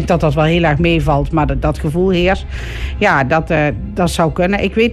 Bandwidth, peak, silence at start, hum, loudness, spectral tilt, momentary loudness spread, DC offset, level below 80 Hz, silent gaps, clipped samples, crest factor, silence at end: 13 kHz; -2 dBFS; 0 s; none; -15 LUFS; -6.5 dB/octave; 5 LU; under 0.1%; -24 dBFS; none; under 0.1%; 12 dB; 0 s